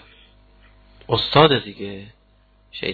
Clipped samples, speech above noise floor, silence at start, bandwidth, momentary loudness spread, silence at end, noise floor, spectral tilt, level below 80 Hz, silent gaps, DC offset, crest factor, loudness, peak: under 0.1%; 38 dB; 1.1 s; 4.8 kHz; 23 LU; 0 s; -56 dBFS; -7.5 dB/octave; -48 dBFS; none; under 0.1%; 22 dB; -17 LUFS; 0 dBFS